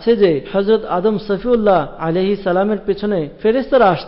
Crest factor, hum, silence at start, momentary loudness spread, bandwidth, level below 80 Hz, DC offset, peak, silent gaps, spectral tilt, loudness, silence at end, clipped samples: 12 dB; none; 0 s; 6 LU; 5.8 kHz; -44 dBFS; under 0.1%; -4 dBFS; none; -11 dB/octave; -16 LUFS; 0 s; under 0.1%